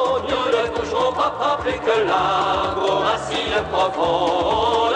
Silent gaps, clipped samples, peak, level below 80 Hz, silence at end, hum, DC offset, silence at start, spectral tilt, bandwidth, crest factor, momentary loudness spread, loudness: none; under 0.1%; -6 dBFS; -44 dBFS; 0 s; none; under 0.1%; 0 s; -4.5 dB/octave; 9.8 kHz; 14 dB; 3 LU; -20 LUFS